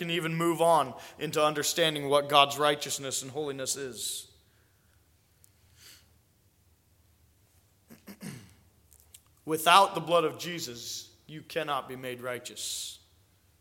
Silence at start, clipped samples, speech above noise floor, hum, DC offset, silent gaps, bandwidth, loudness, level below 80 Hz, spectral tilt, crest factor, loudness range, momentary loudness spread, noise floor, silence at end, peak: 0 s; under 0.1%; 38 dB; none; under 0.1%; none; 17 kHz; -28 LUFS; -70 dBFS; -3 dB/octave; 26 dB; 13 LU; 20 LU; -66 dBFS; 0.65 s; -4 dBFS